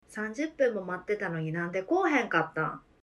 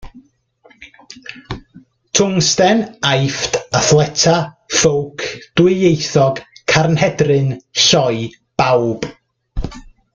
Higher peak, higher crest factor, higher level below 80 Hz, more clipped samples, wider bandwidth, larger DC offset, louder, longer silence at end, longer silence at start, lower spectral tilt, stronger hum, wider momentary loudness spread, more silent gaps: second, -10 dBFS vs 0 dBFS; about the same, 20 dB vs 16 dB; second, -68 dBFS vs -38 dBFS; neither; first, 12 kHz vs 9.4 kHz; neither; second, -30 LUFS vs -15 LUFS; about the same, 0.25 s vs 0.35 s; about the same, 0.1 s vs 0.05 s; first, -6.5 dB/octave vs -4 dB/octave; neither; second, 8 LU vs 17 LU; neither